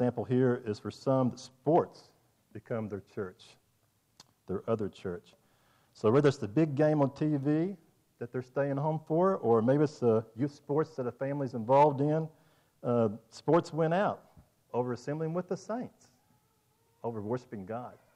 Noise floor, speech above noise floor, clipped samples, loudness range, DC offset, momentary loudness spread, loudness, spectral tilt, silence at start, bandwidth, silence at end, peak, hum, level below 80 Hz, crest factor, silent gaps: -72 dBFS; 42 dB; under 0.1%; 9 LU; under 0.1%; 15 LU; -31 LUFS; -8 dB/octave; 0 s; 10.5 kHz; 0.25 s; -14 dBFS; none; -74 dBFS; 16 dB; none